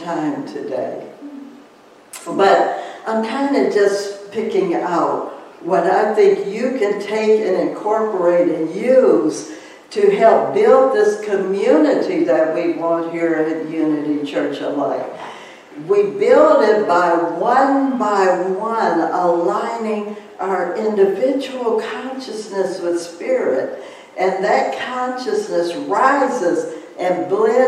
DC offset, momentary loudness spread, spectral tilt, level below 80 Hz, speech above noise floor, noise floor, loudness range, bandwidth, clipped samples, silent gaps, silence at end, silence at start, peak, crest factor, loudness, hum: under 0.1%; 14 LU; -5.5 dB/octave; -70 dBFS; 29 dB; -46 dBFS; 6 LU; 12.5 kHz; under 0.1%; none; 0 s; 0 s; -2 dBFS; 16 dB; -17 LUFS; none